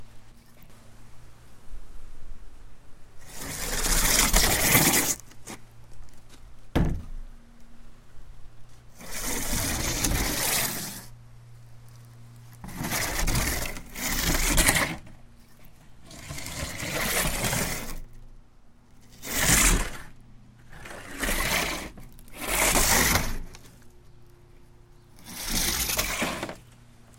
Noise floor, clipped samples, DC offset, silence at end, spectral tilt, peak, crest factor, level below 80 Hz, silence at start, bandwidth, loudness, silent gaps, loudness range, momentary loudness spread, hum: -52 dBFS; under 0.1%; under 0.1%; 0.15 s; -2 dB/octave; 0 dBFS; 28 dB; -36 dBFS; 0 s; 17 kHz; -25 LUFS; none; 10 LU; 23 LU; none